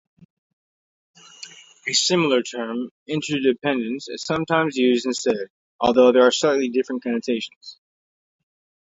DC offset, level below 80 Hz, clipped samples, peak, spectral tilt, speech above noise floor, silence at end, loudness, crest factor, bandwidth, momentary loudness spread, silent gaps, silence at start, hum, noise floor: under 0.1%; -64 dBFS; under 0.1%; -2 dBFS; -3.5 dB/octave; 23 dB; 1.2 s; -21 LUFS; 20 dB; 8 kHz; 17 LU; 2.91-3.06 s, 5.50-5.79 s, 7.56-7.61 s; 1.4 s; none; -44 dBFS